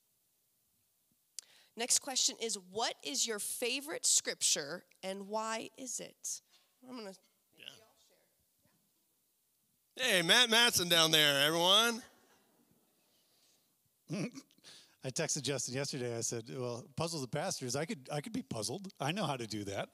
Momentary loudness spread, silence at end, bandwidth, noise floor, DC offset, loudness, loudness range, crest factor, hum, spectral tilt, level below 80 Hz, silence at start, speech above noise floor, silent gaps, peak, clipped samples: 19 LU; 0.05 s; 16 kHz; -77 dBFS; under 0.1%; -32 LUFS; 15 LU; 24 dB; none; -1.5 dB/octave; -80 dBFS; 1.75 s; 43 dB; none; -12 dBFS; under 0.1%